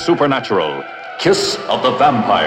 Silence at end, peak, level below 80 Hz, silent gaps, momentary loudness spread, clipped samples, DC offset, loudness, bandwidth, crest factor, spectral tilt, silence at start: 0 s; 0 dBFS; -52 dBFS; none; 9 LU; under 0.1%; under 0.1%; -15 LUFS; 15.5 kHz; 14 dB; -4.5 dB/octave; 0 s